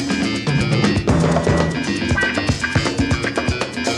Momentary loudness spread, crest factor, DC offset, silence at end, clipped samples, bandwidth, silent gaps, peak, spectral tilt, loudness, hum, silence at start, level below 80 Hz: 4 LU; 16 dB; under 0.1%; 0 s; under 0.1%; 12 kHz; none; -2 dBFS; -5.5 dB/octave; -18 LUFS; none; 0 s; -32 dBFS